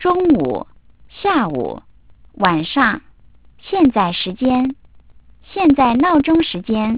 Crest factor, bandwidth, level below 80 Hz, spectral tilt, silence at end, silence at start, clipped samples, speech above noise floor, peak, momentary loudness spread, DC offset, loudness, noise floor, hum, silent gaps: 18 dB; 4 kHz; -44 dBFS; -10 dB/octave; 0 s; 0 s; under 0.1%; 33 dB; 0 dBFS; 13 LU; 0.4%; -16 LUFS; -49 dBFS; none; none